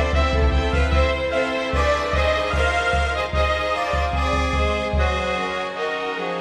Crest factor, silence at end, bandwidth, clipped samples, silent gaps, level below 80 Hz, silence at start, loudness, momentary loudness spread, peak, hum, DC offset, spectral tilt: 14 dB; 0 s; 10 kHz; under 0.1%; none; -26 dBFS; 0 s; -21 LUFS; 5 LU; -6 dBFS; none; under 0.1%; -5.5 dB/octave